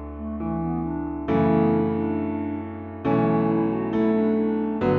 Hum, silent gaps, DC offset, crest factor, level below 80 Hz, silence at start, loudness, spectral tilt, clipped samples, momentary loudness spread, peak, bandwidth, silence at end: none; none; under 0.1%; 14 dB; -44 dBFS; 0 s; -24 LUFS; -8.5 dB/octave; under 0.1%; 9 LU; -8 dBFS; 4.6 kHz; 0 s